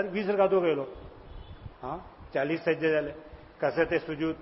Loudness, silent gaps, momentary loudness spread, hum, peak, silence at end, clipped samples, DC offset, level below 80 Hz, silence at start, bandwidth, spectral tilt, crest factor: -29 LUFS; none; 23 LU; none; -10 dBFS; 0 s; under 0.1%; under 0.1%; -54 dBFS; 0 s; 5.8 kHz; -10 dB/octave; 18 dB